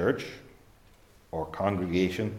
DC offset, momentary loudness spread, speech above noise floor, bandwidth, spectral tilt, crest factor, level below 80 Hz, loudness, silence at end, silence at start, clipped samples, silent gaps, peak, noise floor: under 0.1%; 13 LU; 29 dB; 15.5 kHz; -6.5 dB/octave; 20 dB; -58 dBFS; -31 LUFS; 0 s; 0 s; under 0.1%; none; -10 dBFS; -58 dBFS